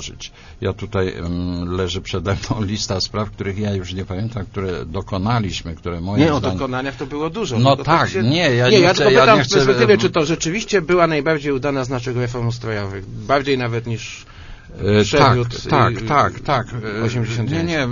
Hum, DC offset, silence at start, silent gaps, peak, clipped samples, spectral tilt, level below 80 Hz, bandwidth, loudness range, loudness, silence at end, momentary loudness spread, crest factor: none; under 0.1%; 0 s; none; 0 dBFS; under 0.1%; -5.5 dB/octave; -40 dBFS; 7.4 kHz; 9 LU; -18 LUFS; 0 s; 13 LU; 18 dB